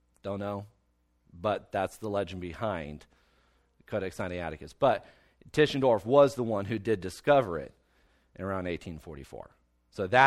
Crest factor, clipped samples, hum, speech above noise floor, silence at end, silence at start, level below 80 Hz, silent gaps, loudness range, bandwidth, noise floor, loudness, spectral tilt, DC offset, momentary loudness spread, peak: 24 dB; under 0.1%; none; 42 dB; 0 s; 0.25 s; -58 dBFS; none; 9 LU; 14 kHz; -71 dBFS; -30 LUFS; -6 dB/octave; under 0.1%; 19 LU; -6 dBFS